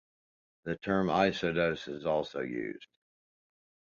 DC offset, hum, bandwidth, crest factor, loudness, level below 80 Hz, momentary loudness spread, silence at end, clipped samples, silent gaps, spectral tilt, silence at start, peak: under 0.1%; none; 7.4 kHz; 22 dB; -32 LUFS; -62 dBFS; 13 LU; 1.1 s; under 0.1%; none; -6.5 dB/octave; 0.65 s; -12 dBFS